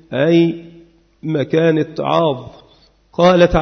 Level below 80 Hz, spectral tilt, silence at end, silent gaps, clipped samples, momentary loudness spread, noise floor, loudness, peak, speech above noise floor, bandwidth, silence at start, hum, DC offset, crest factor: -38 dBFS; -7.5 dB/octave; 0 s; none; under 0.1%; 17 LU; -51 dBFS; -15 LUFS; -2 dBFS; 37 dB; 6.4 kHz; 0.1 s; none; under 0.1%; 14 dB